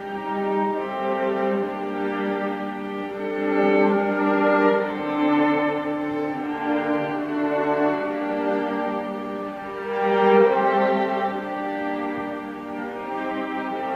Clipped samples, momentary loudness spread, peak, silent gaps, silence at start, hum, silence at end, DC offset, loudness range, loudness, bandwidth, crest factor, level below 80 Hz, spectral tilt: under 0.1%; 11 LU; -6 dBFS; none; 0 s; none; 0 s; under 0.1%; 4 LU; -23 LUFS; 7.2 kHz; 18 dB; -62 dBFS; -7.5 dB/octave